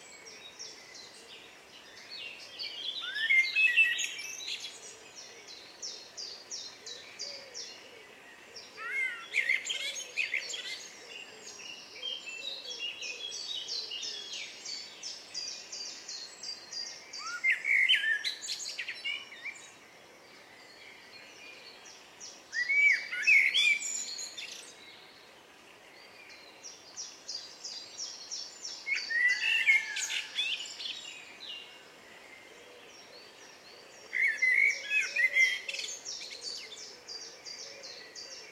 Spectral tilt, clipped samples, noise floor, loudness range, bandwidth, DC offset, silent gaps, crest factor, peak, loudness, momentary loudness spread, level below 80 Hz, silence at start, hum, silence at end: 2 dB/octave; under 0.1%; -55 dBFS; 15 LU; 16 kHz; under 0.1%; none; 22 dB; -14 dBFS; -30 LUFS; 26 LU; -84 dBFS; 0 s; none; 0 s